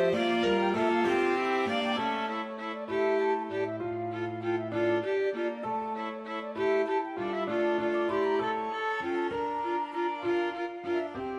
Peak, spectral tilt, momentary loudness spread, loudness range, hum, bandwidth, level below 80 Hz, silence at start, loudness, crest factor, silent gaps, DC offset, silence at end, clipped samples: -16 dBFS; -6 dB/octave; 7 LU; 3 LU; none; 10.5 kHz; -68 dBFS; 0 s; -30 LUFS; 14 dB; none; under 0.1%; 0 s; under 0.1%